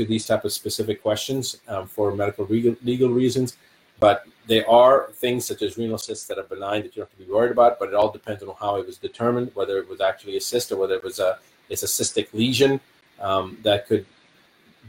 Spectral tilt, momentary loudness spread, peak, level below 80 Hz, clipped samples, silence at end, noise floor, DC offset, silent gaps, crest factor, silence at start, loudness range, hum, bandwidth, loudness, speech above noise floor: -4.5 dB/octave; 12 LU; -4 dBFS; -60 dBFS; under 0.1%; 0 s; -57 dBFS; under 0.1%; none; 20 dB; 0 s; 5 LU; none; 17 kHz; -22 LUFS; 35 dB